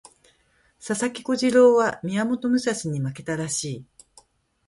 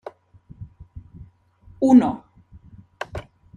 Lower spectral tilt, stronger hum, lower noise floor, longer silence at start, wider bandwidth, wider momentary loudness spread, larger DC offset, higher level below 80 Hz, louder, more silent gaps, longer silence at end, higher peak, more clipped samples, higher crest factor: second, -5 dB/octave vs -7.5 dB/octave; neither; first, -63 dBFS vs -51 dBFS; first, 0.85 s vs 0.6 s; first, 11.5 kHz vs 9.4 kHz; second, 13 LU vs 28 LU; neither; second, -62 dBFS vs -50 dBFS; second, -23 LUFS vs -17 LUFS; neither; first, 0.85 s vs 0.35 s; about the same, -6 dBFS vs -4 dBFS; neither; about the same, 18 dB vs 20 dB